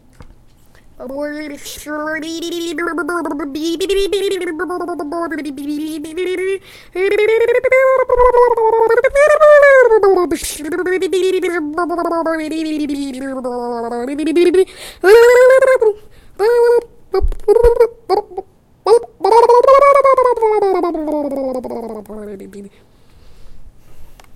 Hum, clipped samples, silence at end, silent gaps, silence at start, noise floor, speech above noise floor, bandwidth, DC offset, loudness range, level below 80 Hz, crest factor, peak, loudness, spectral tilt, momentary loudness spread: none; under 0.1%; 0 s; none; 0.2 s; -44 dBFS; 30 dB; 15.5 kHz; under 0.1%; 10 LU; -34 dBFS; 14 dB; 0 dBFS; -14 LUFS; -4 dB/octave; 16 LU